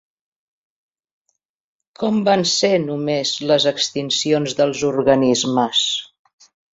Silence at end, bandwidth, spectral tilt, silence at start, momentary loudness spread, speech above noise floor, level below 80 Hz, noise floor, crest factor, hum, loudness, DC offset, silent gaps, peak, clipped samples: 0.7 s; 8 kHz; -3.5 dB/octave; 2 s; 6 LU; 55 dB; -58 dBFS; -72 dBFS; 20 dB; none; -18 LUFS; under 0.1%; none; 0 dBFS; under 0.1%